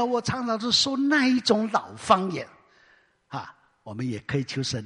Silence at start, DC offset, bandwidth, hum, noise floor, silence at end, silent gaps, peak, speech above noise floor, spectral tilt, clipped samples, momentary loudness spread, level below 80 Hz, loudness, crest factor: 0 s; under 0.1%; 11 kHz; none; -61 dBFS; 0 s; none; -4 dBFS; 36 dB; -4 dB/octave; under 0.1%; 17 LU; -60 dBFS; -24 LUFS; 22 dB